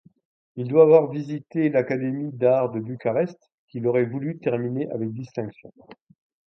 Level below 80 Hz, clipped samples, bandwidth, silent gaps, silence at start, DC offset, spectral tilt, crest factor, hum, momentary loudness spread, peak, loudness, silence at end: -70 dBFS; under 0.1%; 6 kHz; 3.54-3.68 s; 0.55 s; under 0.1%; -10 dB/octave; 20 dB; none; 16 LU; -4 dBFS; -23 LUFS; 0.75 s